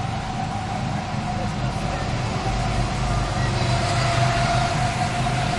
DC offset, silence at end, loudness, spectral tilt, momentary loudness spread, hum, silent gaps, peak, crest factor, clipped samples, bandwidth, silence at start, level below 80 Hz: under 0.1%; 0 s; -23 LUFS; -5 dB/octave; 6 LU; none; none; -8 dBFS; 14 dB; under 0.1%; 11.5 kHz; 0 s; -32 dBFS